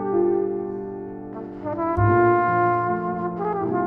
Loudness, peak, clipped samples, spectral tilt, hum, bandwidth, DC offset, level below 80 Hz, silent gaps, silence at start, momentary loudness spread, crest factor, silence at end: -22 LUFS; -8 dBFS; under 0.1%; -11.5 dB/octave; none; 3.7 kHz; under 0.1%; -46 dBFS; none; 0 s; 16 LU; 14 dB; 0 s